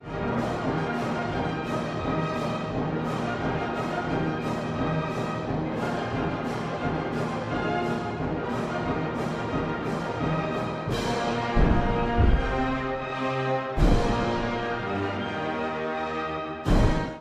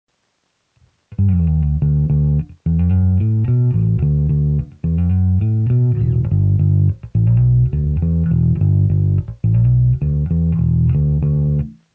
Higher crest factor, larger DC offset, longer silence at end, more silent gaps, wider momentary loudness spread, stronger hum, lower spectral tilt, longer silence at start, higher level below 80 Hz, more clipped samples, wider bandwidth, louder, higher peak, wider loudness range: first, 20 dB vs 10 dB; neither; second, 0 s vs 0.2 s; neither; about the same, 6 LU vs 4 LU; neither; second, -7 dB/octave vs -13 dB/octave; second, 0 s vs 1.1 s; second, -34 dBFS vs -24 dBFS; neither; first, 12.5 kHz vs 2.9 kHz; second, -28 LUFS vs -16 LUFS; about the same, -8 dBFS vs -6 dBFS; about the same, 3 LU vs 1 LU